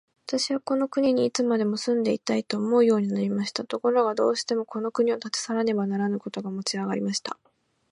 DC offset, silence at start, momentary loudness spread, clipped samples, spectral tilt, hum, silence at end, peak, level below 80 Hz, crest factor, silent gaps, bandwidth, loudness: under 0.1%; 0.3 s; 7 LU; under 0.1%; -5 dB/octave; none; 0.55 s; -8 dBFS; -74 dBFS; 18 dB; none; 11.5 kHz; -25 LUFS